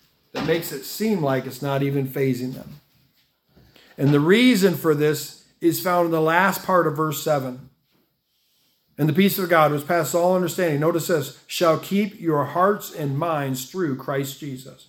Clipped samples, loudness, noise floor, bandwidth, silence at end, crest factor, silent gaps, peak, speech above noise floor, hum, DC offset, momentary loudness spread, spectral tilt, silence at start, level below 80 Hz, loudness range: under 0.1%; -21 LUFS; -68 dBFS; 18 kHz; 0.15 s; 20 dB; none; -2 dBFS; 47 dB; none; under 0.1%; 11 LU; -5.5 dB/octave; 0.35 s; -64 dBFS; 6 LU